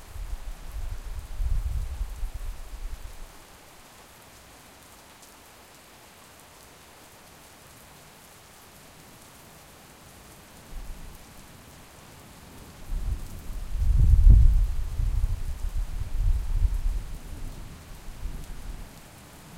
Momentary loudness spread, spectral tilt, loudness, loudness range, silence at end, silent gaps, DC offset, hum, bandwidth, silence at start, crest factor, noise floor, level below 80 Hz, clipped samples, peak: 20 LU; -6 dB/octave; -30 LUFS; 23 LU; 0 s; none; under 0.1%; none; 15.5 kHz; 0 s; 24 dB; -51 dBFS; -28 dBFS; under 0.1%; -4 dBFS